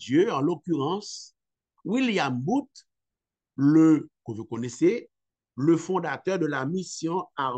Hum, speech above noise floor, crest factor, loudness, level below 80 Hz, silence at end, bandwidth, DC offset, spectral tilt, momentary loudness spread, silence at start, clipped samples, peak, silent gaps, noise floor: none; 64 dB; 16 dB; -25 LUFS; -76 dBFS; 0 s; 8.6 kHz; under 0.1%; -6 dB/octave; 17 LU; 0 s; under 0.1%; -10 dBFS; none; -88 dBFS